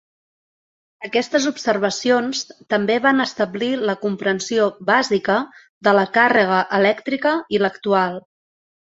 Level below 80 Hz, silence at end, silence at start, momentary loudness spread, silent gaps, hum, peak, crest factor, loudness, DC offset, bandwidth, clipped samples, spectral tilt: -64 dBFS; 0.75 s; 1 s; 7 LU; 5.69-5.81 s; none; -2 dBFS; 18 dB; -19 LUFS; under 0.1%; 8 kHz; under 0.1%; -4 dB/octave